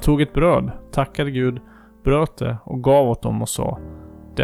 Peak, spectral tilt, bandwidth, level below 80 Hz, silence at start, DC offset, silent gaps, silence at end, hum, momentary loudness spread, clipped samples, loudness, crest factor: -6 dBFS; -6.5 dB/octave; 15.5 kHz; -32 dBFS; 0 s; under 0.1%; none; 0 s; none; 15 LU; under 0.1%; -20 LUFS; 14 dB